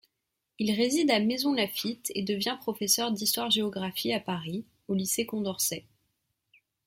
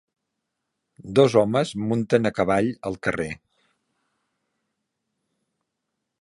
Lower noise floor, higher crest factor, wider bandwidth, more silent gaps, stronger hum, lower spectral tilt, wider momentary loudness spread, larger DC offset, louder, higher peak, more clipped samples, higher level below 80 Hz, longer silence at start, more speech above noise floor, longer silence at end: about the same, -83 dBFS vs -81 dBFS; about the same, 20 dB vs 22 dB; first, 16.5 kHz vs 11.5 kHz; neither; neither; second, -3 dB/octave vs -6.5 dB/octave; second, 8 LU vs 11 LU; neither; second, -28 LUFS vs -22 LUFS; second, -10 dBFS vs -4 dBFS; neither; second, -70 dBFS vs -56 dBFS; second, 0.6 s vs 1.05 s; second, 54 dB vs 59 dB; second, 1.05 s vs 2.9 s